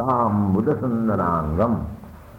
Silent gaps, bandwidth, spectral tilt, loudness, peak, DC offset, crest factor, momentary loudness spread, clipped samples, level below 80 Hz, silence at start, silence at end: none; 15.5 kHz; -10.5 dB/octave; -21 LUFS; -8 dBFS; under 0.1%; 12 dB; 8 LU; under 0.1%; -40 dBFS; 0 s; 0 s